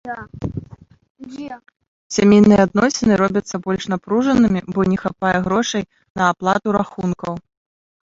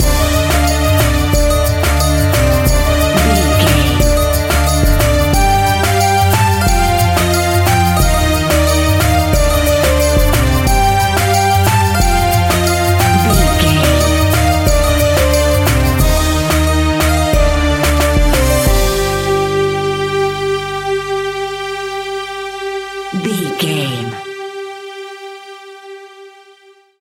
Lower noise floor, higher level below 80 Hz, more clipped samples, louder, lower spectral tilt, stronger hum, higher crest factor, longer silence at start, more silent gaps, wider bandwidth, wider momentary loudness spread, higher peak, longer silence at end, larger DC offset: second, -42 dBFS vs -46 dBFS; second, -46 dBFS vs -18 dBFS; neither; second, -17 LUFS vs -13 LUFS; first, -6 dB/octave vs -4.5 dB/octave; neither; about the same, 16 dB vs 12 dB; about the same, 0.05 s vs 0 s; first, 1.10-1.15 s, 1.88-2.10 s, 6.10-6.15 s vs none; second, 7.8 kHz vs 17 kHz; first, 19 LU vs 10 LU; about the same, -2 dBFS vs 0 dBFS; about the same, 0.7 s vs 0.7 s; neither